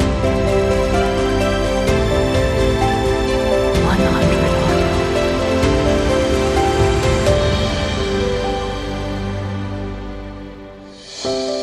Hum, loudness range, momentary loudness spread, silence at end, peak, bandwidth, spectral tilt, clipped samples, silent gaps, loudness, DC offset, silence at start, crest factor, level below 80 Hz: none; 7 LU; 11 LU; 0 s; -2 dBFS; 15 kHz; -5.5 dB/octave; under 0.1%; none; -17 LUFS; under 0.1%; 0 s; 14 dB; -26 dBFS